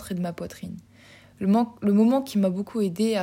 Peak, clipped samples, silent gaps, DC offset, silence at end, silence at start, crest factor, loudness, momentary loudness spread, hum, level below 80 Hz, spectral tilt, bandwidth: -10 dBFS; under 0.1%; none; under 0.1%; 0 s; 0 s; 14 dB; -24 LUFS; 17 LU; none; -60 dBFS; -7 dB/octave; 16 kHz